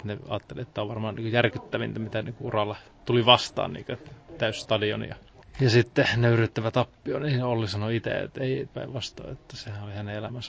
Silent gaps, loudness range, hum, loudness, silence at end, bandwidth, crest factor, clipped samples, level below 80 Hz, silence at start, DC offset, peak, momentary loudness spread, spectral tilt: none; 5 LU; none; -27 LUFS; 0 s; 8 kHz; 24 dB; under 0.1%; -54 dBFS; 0 s; under 0.1%; -2 dBFS; 16 LU; -6 dB/octave